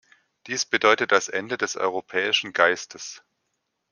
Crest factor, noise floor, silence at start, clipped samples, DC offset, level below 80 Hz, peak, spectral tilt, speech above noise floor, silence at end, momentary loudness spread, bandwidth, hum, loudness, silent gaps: 24 dB; -77 dBFS; 0.45 s; under 0.1%; under 0.1%; -72 dBFS; -2 dBFS; -1.5 dB/octave; 53 dB; 0.75 s; 12 LU; 10.5 kHz; none; -22 LUFS; none